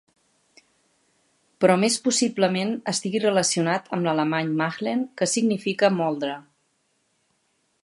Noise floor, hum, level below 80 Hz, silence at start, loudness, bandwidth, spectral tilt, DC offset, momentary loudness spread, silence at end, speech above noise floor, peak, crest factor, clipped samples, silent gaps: -70 dBFS; none; -74 dBFS; 1.6 s; -23 LUFS; 11.5 kHz; -4 dB/octave; under 0.1%; 6 LU; 1.45 s; 47 dB; -4 dBFS; 22 dB; under 0.1%; none